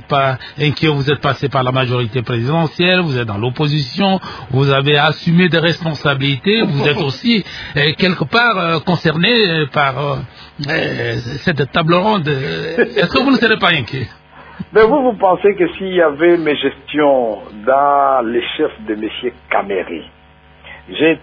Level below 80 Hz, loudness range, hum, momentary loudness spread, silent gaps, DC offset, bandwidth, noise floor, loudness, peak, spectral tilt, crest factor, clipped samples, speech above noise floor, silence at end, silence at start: -46 dBFS; 3 LU; none; 9 LU; none; under 0.1%; 5.4 kHz; -44 dBFS; -15 LUFS; 0 dBFS; -7 dB/octave; 14 dB; under 0.1%; 29 dB; 0.05 s; 0.1 s